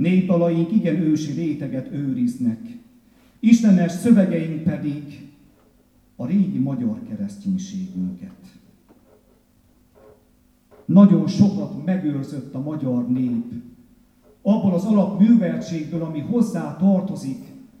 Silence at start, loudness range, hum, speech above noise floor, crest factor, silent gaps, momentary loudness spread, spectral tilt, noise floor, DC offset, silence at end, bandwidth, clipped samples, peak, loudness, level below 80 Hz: 0 s; 8 LU; none; 38 dB; 20 dB; none; 15 LU; -8 dB/octave; -58 dBFS; under 0.1%; 0.2 s; 10.5 kHz; under 0.1%; -2 dBFS; -20 LUFS; -60 dBFS